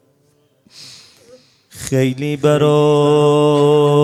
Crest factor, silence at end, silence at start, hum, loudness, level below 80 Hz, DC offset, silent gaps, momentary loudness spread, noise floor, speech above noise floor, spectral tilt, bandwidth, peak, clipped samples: 14 dB; 0 s; 0.8 s; none; -13 LUFS; -54 dBFS; under 0.1%; none; 6 LU; -58 dBFS; 45 dB; -6.5 dB/octave; 13.5 kHz; -2 dBFS; under 0.1%